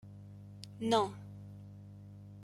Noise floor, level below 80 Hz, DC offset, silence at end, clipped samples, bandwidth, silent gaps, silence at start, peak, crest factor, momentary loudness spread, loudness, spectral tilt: -51 dBFS; -70 dBFS; under 0.1%; 0 s; under 0.1%; 15.5 kHz; none; 0.05 s; -18 dBFS; 22 dB; 21 LU; -34 LUFS; -5.5 dB/octave